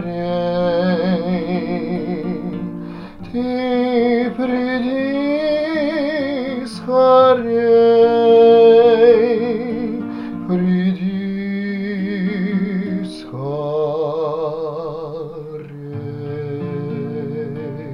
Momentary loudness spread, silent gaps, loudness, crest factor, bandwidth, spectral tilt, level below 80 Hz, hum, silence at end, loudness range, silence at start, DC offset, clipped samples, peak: 16 LU; none; -17 LUFS; 16 dB; 9.8 kHz; -8.5 dB/octave; -50 dBFS; none; 0 s; 12 LU; 0 s; under 0.1%; under 0.1%; 0 dBFS